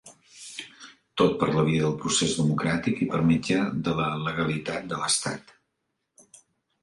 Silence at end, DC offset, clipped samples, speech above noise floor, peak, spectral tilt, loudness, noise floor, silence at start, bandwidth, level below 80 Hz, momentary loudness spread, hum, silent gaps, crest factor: 1.45 s; under 0.1%; under 0.1%; 54 dB; -8 dBFS; -4.5 dB/octave; -25 LUFS; -79 dBFS; 0.05 s; 11.5 kHz; -54 dBFS; 16 LU; none; none; 18 dB